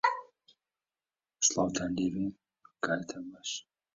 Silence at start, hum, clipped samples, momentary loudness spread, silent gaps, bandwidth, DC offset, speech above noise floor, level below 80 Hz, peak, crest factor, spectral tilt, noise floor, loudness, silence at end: 0.05 s; none; under 0.1%; 13 LU; none; 8 kHz; under 0.1%; over 56 dB; -64 dBFS; -12 dBFS; 24 dB; -3 dB/octave; under -90 dBFS; -33 LUFS; 0.35 s